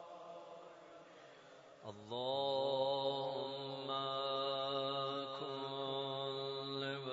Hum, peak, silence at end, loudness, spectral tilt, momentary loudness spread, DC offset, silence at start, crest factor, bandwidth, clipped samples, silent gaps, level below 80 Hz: none; -26 dBFS; 0 s; -40 LUFS; -2.5 dB/octave; 21 LU; under 0.1%; 0 s; 16 dB; 7.6 kHz; under 0.1%; none; -88 dBFS